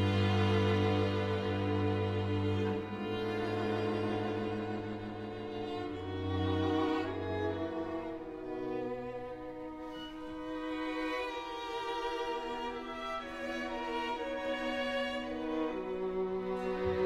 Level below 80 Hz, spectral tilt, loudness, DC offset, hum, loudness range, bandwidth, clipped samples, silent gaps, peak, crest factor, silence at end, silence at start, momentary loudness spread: -58 dBFS; -7 dB/octave; -36 LUFS; under 0.1%; none; 6 LU; 10 kHz; under 0.1%; none; -20 dBFS; 16 dB; 0 s; 0 s; 10 LU